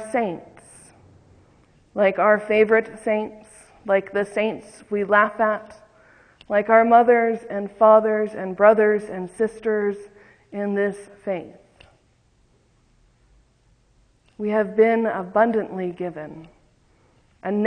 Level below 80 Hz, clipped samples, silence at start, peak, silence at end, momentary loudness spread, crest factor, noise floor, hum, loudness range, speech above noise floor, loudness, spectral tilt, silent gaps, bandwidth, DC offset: -62 dBFS; under 0.1%; 0 s; -2 dBFS; 0 s; 17 LU; 20 dB; -61 dBFS; none; 13 LU; 41 dB; -20 LUFS; -6.5 dB/octave; none; 9.8 kHz; under 0.1%